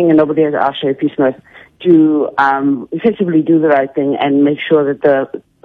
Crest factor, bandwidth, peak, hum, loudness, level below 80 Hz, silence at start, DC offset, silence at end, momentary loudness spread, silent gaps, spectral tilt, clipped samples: 12 dB; 4.5 kHz; 0 dBFS; none; -13 LUFS; -58 dBFS; 0 s; under 0.1%; 0.25 s; 6 LU; none; -9 dB/octave; under 0.1%